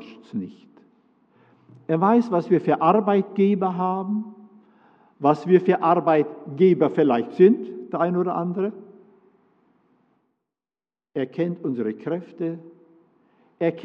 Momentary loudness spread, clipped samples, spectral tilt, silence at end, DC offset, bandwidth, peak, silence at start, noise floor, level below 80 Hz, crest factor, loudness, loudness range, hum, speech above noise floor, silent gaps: 13 LU; under 0.1%; -9.5 dB/octave; 0 s; under 0.1%; 6 kHz; -4 dBFS; 0 s; under -90 dBFS; -82 dBFS; 20 dB; -22 LUFS; 11 LU; none; over 69 dB; none